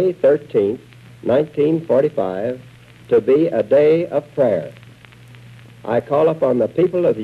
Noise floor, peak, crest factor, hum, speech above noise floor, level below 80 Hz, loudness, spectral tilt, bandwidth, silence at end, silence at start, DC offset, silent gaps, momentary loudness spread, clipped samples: -43 dBFS; -4 dBFS; 12 dB; none; 26 dB; -58 dBFS; -17 LUFS; -8.5 dB/octave; 7.2 kHz; 0 s; 0 s; under 0.1%; none; 11 LU; under 0.1%